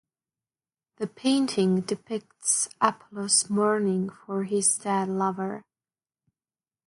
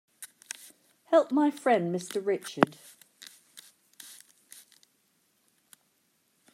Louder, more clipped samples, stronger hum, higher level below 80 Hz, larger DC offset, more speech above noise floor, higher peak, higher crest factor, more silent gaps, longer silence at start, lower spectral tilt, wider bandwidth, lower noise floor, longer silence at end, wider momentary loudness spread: about the same, -25 LUFS vs -27 LUFS; neither; neither; first, -74 dBFS vs -84 dBFS; neither; first, over 64 dB vs 45 dB; second, -6 dBFS vs -2 dBFS; second, 22 dB vs 30 dB; neither; first, 1 s vs 0.2 s; second, -3.5 dB/octave vs -5 dB/octave; second, 11.5 kHz vs 16 kHz; first, under -90 dBFS vs -72 dBFS; second, 1.25 s vs 2.4 s; second, 12 LU vs 26 LU